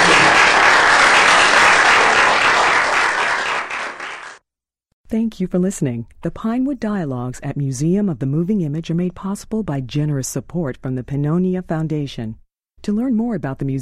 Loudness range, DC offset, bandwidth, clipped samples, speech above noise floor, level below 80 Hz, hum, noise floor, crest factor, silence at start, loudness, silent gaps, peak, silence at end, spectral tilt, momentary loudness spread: 11 LU; under 0.1%; 14 kHz; under 0.1%; 62 dB; -44 dBFS; none; -82 dBFS; 16 dB; 0 s; -16 LUFS; 4.93-5.04 s; -2 dBFS; 0 s; -4 dB/octave; 16 LU